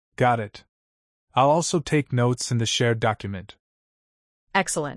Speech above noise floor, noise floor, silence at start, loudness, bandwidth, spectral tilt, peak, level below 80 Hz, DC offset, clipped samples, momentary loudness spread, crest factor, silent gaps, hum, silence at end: over 67 dB; under -90 dBFS; 0.2 s; -23 LUFS; 12 kHz; -4.5 dB/octave; -6 dBFS; -56 dBFS; under 0.1%; under 0.1%; 11 LU; 18 dB; 0.69-1.27 s, 3.59-4.47 s; none; 0 s